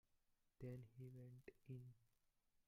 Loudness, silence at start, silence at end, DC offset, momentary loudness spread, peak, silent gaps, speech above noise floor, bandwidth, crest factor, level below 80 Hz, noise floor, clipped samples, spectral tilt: -60 LUFS; 0.15 s; 0.05 s; under 0.1%; 7 LU; -44 dBFS; none; 26 dB; 15.5 kHz; 18 dB; -82 dBFS; -84 dBFS; under 0.1%; -9 dB/octave